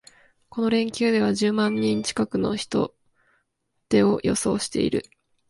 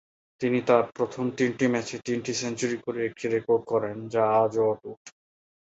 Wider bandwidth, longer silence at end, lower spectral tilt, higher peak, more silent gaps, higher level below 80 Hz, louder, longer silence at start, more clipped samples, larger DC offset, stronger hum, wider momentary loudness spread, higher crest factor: first, 11.5 kHz vs 8.2 kHz; about the same, 0.5 s vs 0.55 s; about the same, -5 dB/octave vs -5 dB/octave; about the same, -6 dBFS vs -6 dBFS; second, none vs 4.97-5.05 s; first, -54 dBFS vs -66 dBFS; first, -23 LUFS vs -26 LUFS; first, 0.55 s vs 0.4 s; neither; neither; neither; about the same, 6 LU vs 8 LU; about the same, 18 dB vs 20 dB